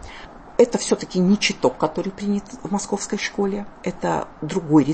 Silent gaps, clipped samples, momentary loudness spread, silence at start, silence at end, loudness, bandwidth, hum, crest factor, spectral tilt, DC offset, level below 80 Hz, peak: none; under 0.1%; 9 LU; 0 s; 0 s; -22 LUFS; 8.8 kHz; none; 18 dB; -5 dB/octave; under 0.1%; -48 dBFS; -2 dBFS